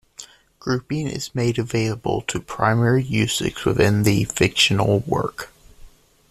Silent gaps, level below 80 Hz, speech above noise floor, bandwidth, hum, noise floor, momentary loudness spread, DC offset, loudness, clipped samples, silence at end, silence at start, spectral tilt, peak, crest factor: none; -46 dBFS; 26 dB; 14 kHz; none; -46 dBFS; 12 LU; under 0.1%; -20 LUFS; under 0.1%; 0.4 s; 0.2 s; -5 dB/octave; -2 dBFS; 18 dB